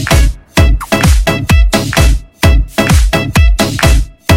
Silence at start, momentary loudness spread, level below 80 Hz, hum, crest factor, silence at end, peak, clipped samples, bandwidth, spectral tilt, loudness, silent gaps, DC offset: 0 s; 2 LU; -12 dBFS; none; 8 dB; 0 s; 0 dBFS; 0.2%; 16.5 kHz; -5 dB/octave; -11 LUFS; none; under 0.1%